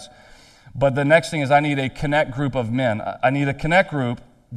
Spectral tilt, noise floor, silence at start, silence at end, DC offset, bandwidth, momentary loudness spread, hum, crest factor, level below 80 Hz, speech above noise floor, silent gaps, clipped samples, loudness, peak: -6.5 dB/octave; -48 dBFS; 0 s; 0 s; under 0.1%; 12 kHz; 7 LU; none; 20 dB; -44 dBFS; 28 dB; none; under 0.1%; -20 LUFS; 0 dBFS